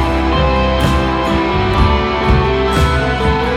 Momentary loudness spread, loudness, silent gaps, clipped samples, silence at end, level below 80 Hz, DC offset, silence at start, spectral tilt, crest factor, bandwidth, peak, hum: 2 LU; -14 LUFS; none; under 0.1%; 0 s; -18 dBFS; under 0.1%; 0 s; -6.5 dB/octave; 12 dB; 13.5 kHz; 0 dBFS; none